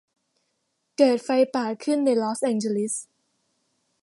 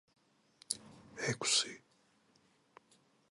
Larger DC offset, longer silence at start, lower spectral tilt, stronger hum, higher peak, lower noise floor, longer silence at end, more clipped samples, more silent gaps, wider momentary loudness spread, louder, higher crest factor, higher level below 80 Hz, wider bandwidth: neither; first, 1 s vs 0.7 s; first, -4.5 dB/octave vs -1.5 dB/octave; neither; first, -6 dBFS vs -12 dBFS; about the same, -75 dBFS vs -72 dBFS; second, 1 s vs 1.55 s; neither; neither; second, 8 LU vs 19 LU; first, -23 LUFS vs -35 LUFS; second, 20 dB vs 32 dB; about the same, -80 dBFS vs -80 dBFS; about the same, 11.5 kHz vs 11.5 kHz